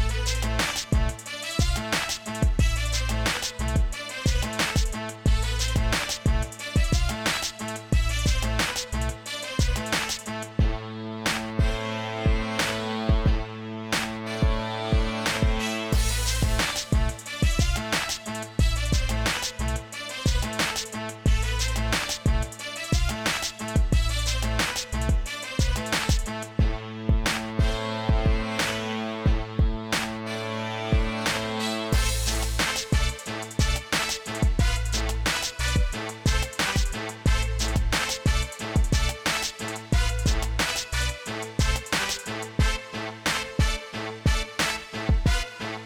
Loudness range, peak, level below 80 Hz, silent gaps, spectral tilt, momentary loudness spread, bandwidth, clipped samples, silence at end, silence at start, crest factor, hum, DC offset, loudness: 1 LU; -12 dBFS; -28 dBFS; none; -4 dB/octave; 6 LU; 19 kHz; under 0.1%; 0 s; 0 s; 14 dB; none; under 0.1%; -26 LUFS